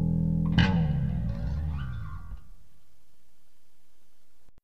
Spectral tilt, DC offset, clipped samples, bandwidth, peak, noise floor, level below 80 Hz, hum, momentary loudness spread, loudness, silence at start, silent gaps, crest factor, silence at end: -8 dB/octave; 1%; under 0.1%; 6.4 kHz; -8 dBFS; -69 dBFS; -38 dBFS; none; 19 LU; -28 LUFS; 0 s; none; 22 dB; 0 s